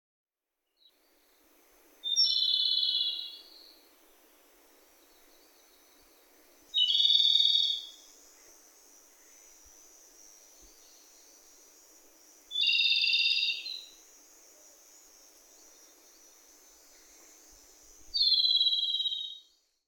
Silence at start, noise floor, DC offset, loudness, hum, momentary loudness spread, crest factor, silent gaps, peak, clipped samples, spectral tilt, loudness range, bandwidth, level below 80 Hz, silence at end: 2.05 s; -85 dBFS; under 0.1%; -25 LUFS; none; 18 LU; 22 dB; none; -10 dBFS; under 0.1%; 3.5 dB/octave; 10 LU; 18 kHz; -74 dBFS; 0.5 s